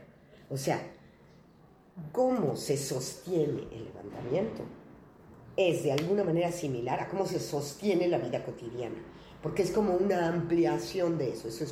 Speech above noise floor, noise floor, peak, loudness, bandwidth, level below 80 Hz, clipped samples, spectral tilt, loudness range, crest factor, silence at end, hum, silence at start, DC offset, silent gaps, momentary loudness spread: 28 dB; -59 dBFS; -14 dBFS; -31 LUFS; 16 kHz; -62 dBFS; under 0.1%; -6 dB/octave; 3 LU; 18 dB; 0 s; none; 0 s; under 0.1%; none; 15 LU